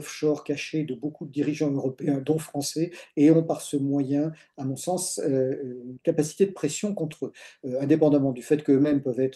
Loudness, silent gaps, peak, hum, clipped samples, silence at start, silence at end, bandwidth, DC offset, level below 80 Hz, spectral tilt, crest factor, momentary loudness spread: -26 LUFS; none; -8 dBFS; none; under 0.1%; 0 s; 0 s; 12.5 kHz; under 0.1%; -70 dBFS; -6 dB/octave; 18 dB; 12 LU